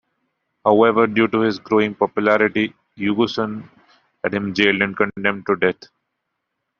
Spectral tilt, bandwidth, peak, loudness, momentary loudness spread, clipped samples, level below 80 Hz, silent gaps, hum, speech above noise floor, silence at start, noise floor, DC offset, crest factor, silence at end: -3.5 dB/octave; 7 kHz; -2 dBFS; -19 LUFS; 10 LU; under 0.1%; -60 dBFS; none; none; 58 dB; 0.65 s; -77 dBFS; under 0.1%; 18 dB; 1.1 s